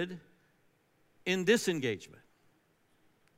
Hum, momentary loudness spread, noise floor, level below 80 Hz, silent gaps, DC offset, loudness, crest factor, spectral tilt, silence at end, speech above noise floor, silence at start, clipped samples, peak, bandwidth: none; 14 LU; -71 dBFS; -80 dBFS; none; under 0.1%; -32 LUFS; 22 dB; -4 dB/octave; 1.25 s; 39 dB; 0 s; under 0.1%; -14 dBFS; 16 kHz